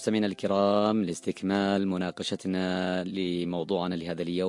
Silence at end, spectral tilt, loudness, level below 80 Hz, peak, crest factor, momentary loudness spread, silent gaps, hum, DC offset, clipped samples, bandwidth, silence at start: 0 s; -6 dB/octave; -28 LUFS; -70 dBFS; -12 dBFS; 16 dB; 7 LU; none; none; under 0.1%; under 0.1%; 11.5 kHz; 0 s